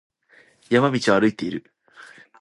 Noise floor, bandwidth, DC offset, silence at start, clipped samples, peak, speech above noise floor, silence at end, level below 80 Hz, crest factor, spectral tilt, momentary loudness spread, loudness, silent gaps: -56 dBFS; 11.5 kHz; under 0.1%; 0.7 s; under 0.1%; -4 dBFS; 36 dB; 0.35 s; -62 dBFS; 20 dB; -5.5 dB/octave; 12 LU; -21 LUFS; none